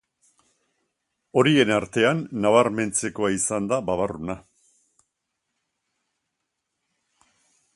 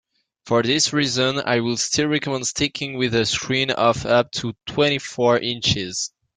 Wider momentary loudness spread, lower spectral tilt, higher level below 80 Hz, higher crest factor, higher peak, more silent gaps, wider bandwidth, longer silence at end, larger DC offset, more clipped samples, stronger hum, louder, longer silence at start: first, 9 LU vs 6 LU; about the same, -4.5 dB/octave vs -3.5 dB/octave; second, -58 dBFS vs -52 dBFS; about the same, 22 dB vs 18 dB; about the same, -2 dBFS vs -4 dBFS; neither; first, 11.5 kHz vs 9.8 kHz; first, 3.35 s vs 0.3 s; neither; neither; neither; about the same, -22 LUFS vs -20 LUFS; first, 1.35 s vs 0.45 s